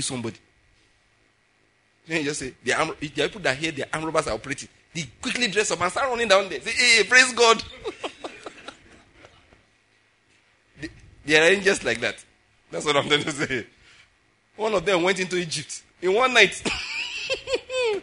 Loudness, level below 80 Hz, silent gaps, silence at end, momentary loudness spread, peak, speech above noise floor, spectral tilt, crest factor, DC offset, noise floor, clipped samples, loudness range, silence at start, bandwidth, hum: -22 LUFS; -56 dBFS; none; 0 s; 20 LU; 0 dBFS; 41 dB; -2.5 dB/octave; 24 dB; under 0.1%; -64 dBFS; under 0.1%; 9 LU; 0 s; 11 kHz; none